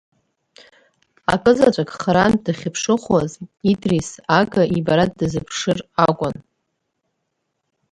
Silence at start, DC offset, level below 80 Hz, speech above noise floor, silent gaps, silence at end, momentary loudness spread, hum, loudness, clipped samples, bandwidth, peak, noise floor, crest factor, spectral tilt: 1.3 s; under 0.1%; -48 dBFS; 56 dB; none; 1.6 s; 8 LU; none; -19 LUFS; under 0.1%; 11.5 kHz; 0 dBFS; -74 dBFS; 20 dB; -5.5 dB/octave